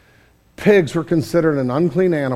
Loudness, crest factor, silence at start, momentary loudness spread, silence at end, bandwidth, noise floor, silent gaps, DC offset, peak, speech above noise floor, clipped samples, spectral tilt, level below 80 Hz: -17 LUFS; 16 dB; 0.6 s; 5 LU; 0 s; 14 kHz; -53 dBFS; none; under 0.1%; 0 dBFS; 37 dB; under 0.1%; -7.5 dB/octave; -50 dBFS